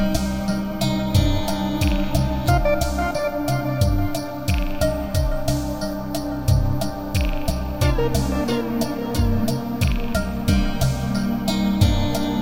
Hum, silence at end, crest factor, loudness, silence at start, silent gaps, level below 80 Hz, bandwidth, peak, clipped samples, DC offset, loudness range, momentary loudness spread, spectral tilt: none; 0 s; 16 dB; -22 LUFS; 0 s; none; -26 dBFS; 17 kHz; -4 dBFS; under 0.1%; 1%; 2 LU; 5 LU; -6 dB/octave